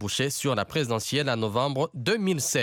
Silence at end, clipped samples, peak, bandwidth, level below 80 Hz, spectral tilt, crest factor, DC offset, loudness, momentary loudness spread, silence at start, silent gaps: 0 s; under 0.1%; -12 dBFS; 17.5 kHz; -62 dBFS; -4 dB/octave; 16 dB; under 0.1%; -26 LUFS; 2 LU; 0 s; none